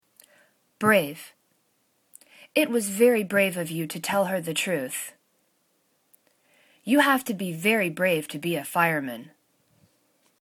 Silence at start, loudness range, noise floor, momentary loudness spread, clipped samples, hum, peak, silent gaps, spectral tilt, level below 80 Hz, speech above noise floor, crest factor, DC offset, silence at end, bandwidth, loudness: 0.8 s; 3 LU; -70 dBFS; 12 LU; under 0.1%; none; -6 dBFS; none; -4 dB/octave; -76 dBFS; 45 dB; 20 dB; under 0.1%; 1.15 s; 19 kHz; -24 LUFS